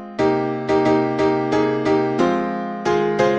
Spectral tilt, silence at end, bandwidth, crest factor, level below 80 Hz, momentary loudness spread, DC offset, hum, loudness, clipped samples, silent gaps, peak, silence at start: -6.5 dB/octave; 0 s; 8.2 kHz; 14 dB; -50 dBFS; 4 LU; under 0.1%; none; -19 LUFS; under 0.1%; none; -4 dBFS; 0 s